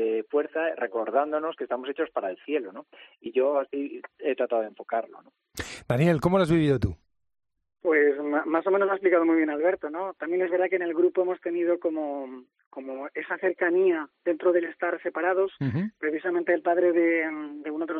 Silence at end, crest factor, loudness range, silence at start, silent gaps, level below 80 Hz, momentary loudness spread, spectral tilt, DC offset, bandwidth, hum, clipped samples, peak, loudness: 0 s; 16 dB; 5 LU; 0 s; 12.66-12.71 s; -56 dBFS; 13 LU; -7.5 dB/octave; under 0.1%; 10 kHz; none; under 0.1%; -10 dBFS; -26 LUFS